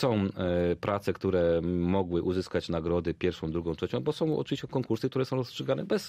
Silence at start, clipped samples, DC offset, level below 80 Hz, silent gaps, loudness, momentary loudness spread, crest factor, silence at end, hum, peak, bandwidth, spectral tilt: 0 s; under 0.1%; under 0.1%; -52 dBFS; none; -30 LUFS; 5 LU; 16 dB; 0 s; none; -14 dBFS; 15 kHz; -7 dB/octave